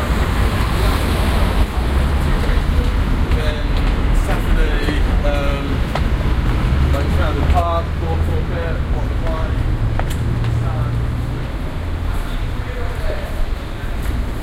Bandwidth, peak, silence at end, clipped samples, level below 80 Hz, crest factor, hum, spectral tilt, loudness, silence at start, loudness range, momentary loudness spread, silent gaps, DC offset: 16 kHz; -2 dBFS; 0 s; under 0.1%; -18 dBFS; 14 dB; none; -6.5 dB/octave; -20 LUFS; 0 s; 4 LU; 7 LU; none; under 0.1%